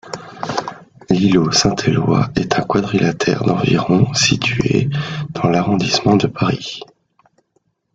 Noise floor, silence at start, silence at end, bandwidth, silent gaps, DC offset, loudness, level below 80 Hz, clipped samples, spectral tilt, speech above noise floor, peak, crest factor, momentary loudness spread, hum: -65 dBFS; 0.05 s; 1.1 s; 9.2 kHz; none; under 0.1%; -16 LUFS; -44 dBFS; under 0.1%; -5 dB/octave; 49 dB; 0 dBFS; 16 dB; 11 LU; none